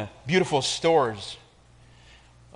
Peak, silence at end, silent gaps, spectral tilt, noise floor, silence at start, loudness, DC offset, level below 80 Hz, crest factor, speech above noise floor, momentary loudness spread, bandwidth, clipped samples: -10 dBFS; 1.2 s; none; -4 dB/octave; -54 dBFS; 0 s; -23 LUFS; under 0.1%; -58 dBFS; 18 dB; 30 dB; 16 LU; 10.5 kHz; under 0.1%